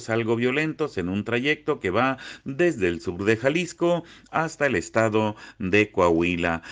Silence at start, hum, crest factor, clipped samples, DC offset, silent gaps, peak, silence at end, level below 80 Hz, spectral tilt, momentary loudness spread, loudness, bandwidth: 0 s; none; 18 dB; under 0.1%; under 0.1%; none; -6 dBFS; 0 s; -54 dBFS; -6 dB/octave; 7 LU; -24 LUFS; 9.6 kHz